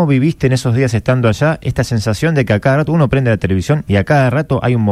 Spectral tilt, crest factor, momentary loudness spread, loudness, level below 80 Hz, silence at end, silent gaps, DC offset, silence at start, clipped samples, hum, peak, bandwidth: -7 dB/octave; 12 dB; 3 LU; -14 LUFS; -36 dBFS; 0 s; none; under 0.1%; 0 s; under 0.1%; none; -2 dBFS; 13.5 kHz